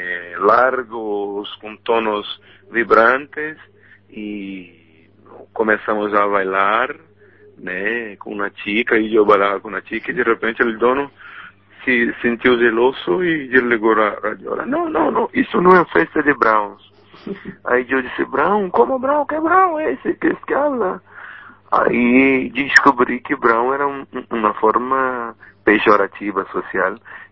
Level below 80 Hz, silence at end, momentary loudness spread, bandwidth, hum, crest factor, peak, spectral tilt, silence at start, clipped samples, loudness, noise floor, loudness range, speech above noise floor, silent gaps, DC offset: -52 dBFS; 0.05 s; 16 LU; 8 kHz; none; 18 dB; 0 dBFS; -6 dB/octave; 0 s; under 0.1%; -17 LUFS; -49 dBFS; 4 LU; 32 dB; none; 0.1%